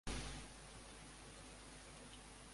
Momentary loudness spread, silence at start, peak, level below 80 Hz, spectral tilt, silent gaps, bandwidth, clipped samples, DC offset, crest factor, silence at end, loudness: 8 LU; 0.05 s; -32 dBFS; -58 dBFS; -3 dB/octave; none; 11.5 kHz; under 0.1%; under 0.1%; 20 dB; 0 s; -54 LUFS